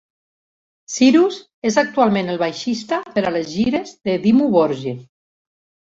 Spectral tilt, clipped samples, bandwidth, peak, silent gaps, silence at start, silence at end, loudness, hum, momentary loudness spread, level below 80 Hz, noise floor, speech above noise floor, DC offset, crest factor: -5 dB/octave; under 0.1%; 7.8 kHz; -2 dBFS; 1.53-1.62 s; 0.9 s; 0.9 s; -18 LUFS; none; 10 LU; -58 dBFS; under -90 dBFS; over 73 dB; under 0.1%; 16 dB